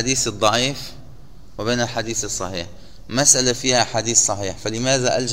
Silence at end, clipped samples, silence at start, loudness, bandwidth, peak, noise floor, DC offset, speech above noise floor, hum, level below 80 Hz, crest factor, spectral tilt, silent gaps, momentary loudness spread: 0 s; under 0.1%; 0 s; -18 LUFS; 16 kHz; 0 dBFS; -43 dBFS; 1%; 23 dB; none; -44 dBFS; 20 dB; -2.5 dB/octave; none; 14 LU